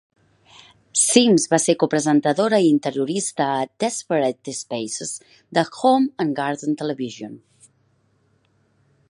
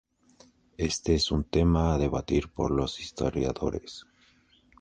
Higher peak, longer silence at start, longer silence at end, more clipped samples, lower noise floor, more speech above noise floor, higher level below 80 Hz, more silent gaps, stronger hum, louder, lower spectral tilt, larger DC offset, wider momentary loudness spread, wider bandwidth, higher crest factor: first, -2 dBFS vs -12 dBFS; first, 0.95 s vs 0.8 s; first, 1.75 s vs 0.8 s; neither; about the same, -63 dBFS vs -63 dBFS; first, 43 dB vs 35 dB; second, -70 dBFS vs -38 dBFS; neither; neither; first, -20 LUFS vs -28 LUFS; second, -4 dB/octave vs -6 dB/octave; neither; first, 13 LU vs 9 LU; first, 11.5 kHz vs 9.8 kHz; about the same, 20 dB vs 18 dB